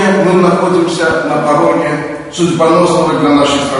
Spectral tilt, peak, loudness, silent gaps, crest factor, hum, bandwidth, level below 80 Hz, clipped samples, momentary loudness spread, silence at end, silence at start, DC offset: -5.5 dB/octave; 0 dBFS; -11 LUFS; none; 10 dB; none; 11 kHz; -44 dBFS; under 0.1%; 6 LU; 0 s; 0 s; under 0.1%